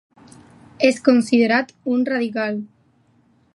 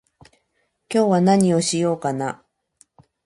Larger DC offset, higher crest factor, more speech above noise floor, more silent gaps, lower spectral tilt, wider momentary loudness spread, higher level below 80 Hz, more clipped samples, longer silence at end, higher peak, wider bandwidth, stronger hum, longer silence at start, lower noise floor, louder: neither; about the same, 20 dB vs 20 dB; second, 41 dB vs 52 dB; neither; about the same, -5 dB/octave vs -5.5 dB/octave; about the same, 10 LU vs 12 LU; second, -68 dBFS vs -62 dBFS; neither; about the same, 0.9 s vs 0.9 s; about the same, -2 dBFS vs -2 dBFS; about the same, 11.5 kHz vs 11.5 kHz; neither; about the same, 0.8 s vs 0.9 s; second, -59 dBFS vs -70 dBFS; about the same, -19 LUFS vs -19 LUFS